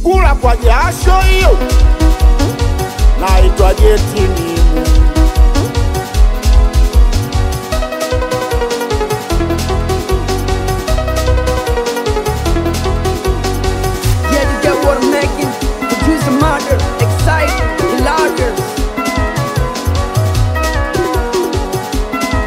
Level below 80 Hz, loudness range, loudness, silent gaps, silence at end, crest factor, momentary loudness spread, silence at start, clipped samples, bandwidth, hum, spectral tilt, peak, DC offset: -14 dBFS; 4 LU; -13 LUFS; none; 0 s; 12 dB; 5 LU; 0 s; under 0.1%; 16 kHz; none; -5.5 dB/octave; 0 dBFS; under 0.1%